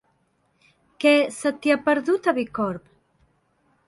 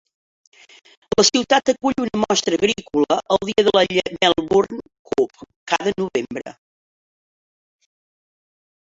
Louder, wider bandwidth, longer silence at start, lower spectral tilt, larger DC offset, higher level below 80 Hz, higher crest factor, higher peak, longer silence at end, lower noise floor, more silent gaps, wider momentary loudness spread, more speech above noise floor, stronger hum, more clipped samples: second, -22 LUFS vs -19 LUFS; first, 11.5 kHz vs 8 kHz; about the same, 1 s vs 1.1 s; first, -4.5 dB/octave vs -3 dB/octave; neither; second, -64 dBFS vs -54 dBFS; about the same, 18 dB vs 20 dB; second, -6 dBFS vs -2 dBFS; second, 1.1 s vs 2.5 s; second, -67 dBFS vs under -90 dBFS; second, none vs 4.99-5.05 s, 5.56-5.67 s; about the same, 9 LU vs 10 LU; second, 46 dB vs over 71 dB; neither; neither